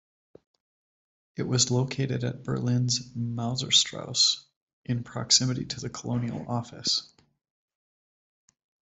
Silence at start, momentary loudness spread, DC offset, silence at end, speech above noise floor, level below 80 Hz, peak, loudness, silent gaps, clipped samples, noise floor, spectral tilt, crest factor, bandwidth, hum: 1.35 s; 12 LU; under 0.1%; 1.85 s; over 63 dB; -62 dBFS; -8 dBFS; -26 LUFS; 4.56-4.67 s, 4.73-4.84 s; under 0.1%; under -90 dBFS; -3.5 dB/octave; 22 dB; 8.4 kHz; none